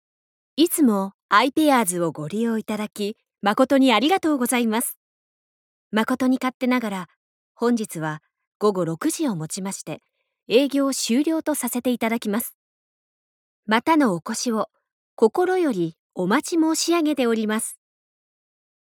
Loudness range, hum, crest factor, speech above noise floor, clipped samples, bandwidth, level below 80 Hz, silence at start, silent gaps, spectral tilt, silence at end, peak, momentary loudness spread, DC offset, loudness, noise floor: 4 LU; none; 20 dB; over 69 dB; under 0.1%; 19 kHz; -72 dBFS; 0.55 s; 1.14-1.29 s, 4.96-5.91 s, 6.54-6.60 s, 7.16-7.55 s, 8.47-8.60 s, 12.54-13.63 s, 14.92-15.17 s, 15.99-16.10 s; -4 dB/octave; 1.05 s; -4 dBFS; 12 LU; under 0.1%; -22 LUFS; under -90 dBFS